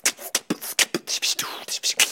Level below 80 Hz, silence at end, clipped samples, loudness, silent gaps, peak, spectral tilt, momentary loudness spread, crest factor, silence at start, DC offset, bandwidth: -72 dBFS; 0 s; under 0.1%; -23 LUFS; none; -2 dBFS; 0 dB/octave; 6 LU; 22 dB; 0.05 s; under 0.1%; 17 kHz